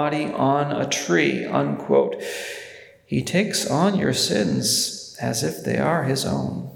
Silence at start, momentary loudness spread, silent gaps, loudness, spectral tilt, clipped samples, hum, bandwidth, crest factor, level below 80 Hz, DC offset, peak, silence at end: 0 s; 9 LU; none; -22 LUFS; -4 dB/octave; under 0.1%; none; 19 kHz; 18 dB; -60 dBFS; under 0.1%; -4 dBFS; 0 s